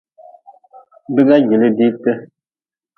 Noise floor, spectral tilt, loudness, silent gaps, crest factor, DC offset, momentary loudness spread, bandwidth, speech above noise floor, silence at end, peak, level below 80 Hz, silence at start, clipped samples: under -90 dBFS; -9.5 dB/octave; -14 LUFS; none; 16 dB; under 0.1%; 9 LU; 4.5 kHz; over 77 dB; 0.7 s; 0 dBFS; -68 dBFS; 1.1 s; under 0.1%